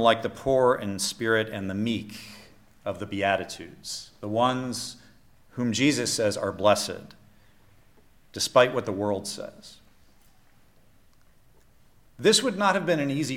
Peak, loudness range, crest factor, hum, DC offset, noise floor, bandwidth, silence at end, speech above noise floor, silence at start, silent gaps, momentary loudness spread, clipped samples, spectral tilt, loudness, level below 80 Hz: -6 dBFS; 4 LU; 22 dB; none; under 0.1%; -56 dBFS; 16.5 kHz; 0 s; 31 dB; 0 s; none; 16 LU; under 0.1%; -4 dB/octave; -25 LUFS; -60 dBFS